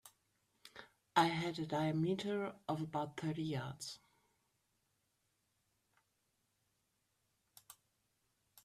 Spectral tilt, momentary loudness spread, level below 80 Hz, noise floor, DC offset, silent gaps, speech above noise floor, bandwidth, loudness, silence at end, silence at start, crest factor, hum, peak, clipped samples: -5.5 dB/octave; 23 LU; -78 dBFS; -83 dBFS; under 0.1%; none; 44 dB; 15 kHz; -39 LUFS; 0.9 s; 0.05 s; 26 dB; none; -16 dBFS; under 0.1%